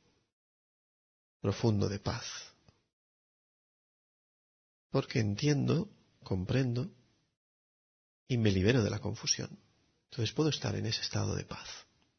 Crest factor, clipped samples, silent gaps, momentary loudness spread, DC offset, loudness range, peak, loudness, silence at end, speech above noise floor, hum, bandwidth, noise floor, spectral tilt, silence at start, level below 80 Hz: 20 dB; under 0.1%; 2.93-4.90 s, 7.37-8.26 s; 15 LU; under 0.1%; 6 LU; -14 dBFS; -33 LUFS; 0.35 s; 31 dB; none; 6.6 kHz; -63 dBFS; -5.5 dB/octave; 1.45 s; -62 dBFS